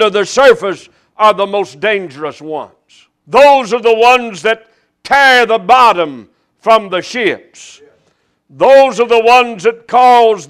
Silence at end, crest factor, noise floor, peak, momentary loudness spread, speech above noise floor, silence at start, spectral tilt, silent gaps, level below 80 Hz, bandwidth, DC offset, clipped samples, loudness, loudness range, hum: 0.05 s; 10 dB; -58 dBFS; 0 dBFS; 14 LU; 49 dB; 0 s; -3 dB/octave; none; -52 dBFS; 15.5 kHz; under 0.1%; 0.6%; -10 LUFS; 4 LU; none